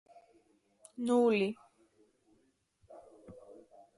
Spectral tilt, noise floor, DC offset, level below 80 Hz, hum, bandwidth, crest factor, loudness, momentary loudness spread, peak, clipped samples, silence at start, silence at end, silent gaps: -6 dB/octave; -73 dBFS; under 0.1%; -78 dBFS; none; 11.5 kHz; 20 dB; -31 LUFS; 27 LU; -18 dBFS; under 0.1%; 1 s; 0.45 s; none